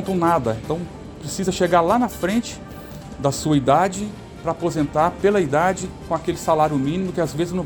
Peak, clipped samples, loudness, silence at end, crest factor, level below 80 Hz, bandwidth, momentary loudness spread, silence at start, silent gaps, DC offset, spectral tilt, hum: -2 dBFS; under 0.1%; -21 LUFS; 0 s; 18 dB; -44 dBFS; 19 kHz; 14 LU; 0 s; none; under 0.1%; -5.5 dB/octave; none